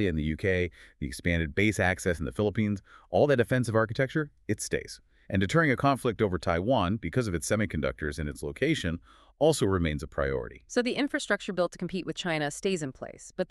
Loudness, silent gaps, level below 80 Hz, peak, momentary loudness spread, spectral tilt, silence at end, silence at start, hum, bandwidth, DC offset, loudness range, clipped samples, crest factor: -29 LUFS; none; -46 dBFS; -10 dBFS; 10 LU; -5.5 dB/octave; 0.05 s; 0 s; none; 13.5 kHz; under 0.1%; 2 LU; under 0.1%; 20 dB